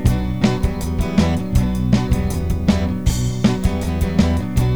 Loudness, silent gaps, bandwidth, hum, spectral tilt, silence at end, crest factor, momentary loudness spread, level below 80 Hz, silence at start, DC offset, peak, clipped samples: -19 LUFS; none; over 20 kHz; none; -6.5 dB/octave; 0 s; 16 dB; 3 LU; -24 dBFS; 0 s; 2%; -2 dBFS; under 0.1%